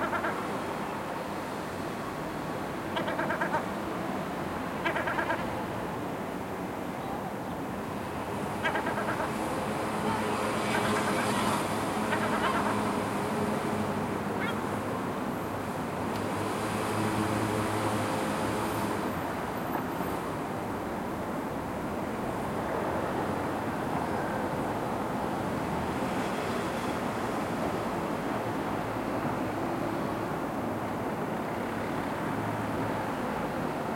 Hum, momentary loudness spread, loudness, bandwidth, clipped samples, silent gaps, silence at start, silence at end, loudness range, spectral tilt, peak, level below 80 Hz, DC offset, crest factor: none; 6 LU; -32 LUFS; 16.5 kHz; under 0.1%; none; 0 s; 0 s; 4 LU; -5.5 dB/octave; -14 dBFS; -54 dBFS; under 0.1%; 18 dB